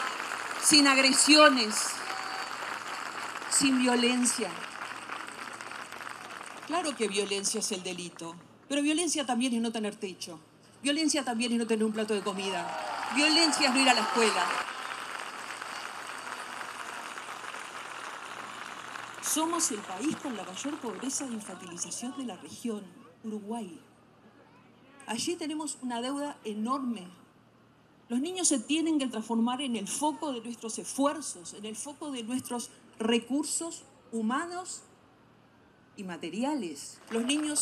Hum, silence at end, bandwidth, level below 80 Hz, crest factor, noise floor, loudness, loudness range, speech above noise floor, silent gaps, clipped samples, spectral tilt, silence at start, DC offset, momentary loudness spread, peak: none; 0 s; 14.5 kHz; -80 dBFS; 26 dB; -60 dBFS; -29 LUFS; 12 LU; 31 dB; none; under 0.1%; -1.5 dB/octave; 0 s; under 0.1%; 17 LU; -6 dBFS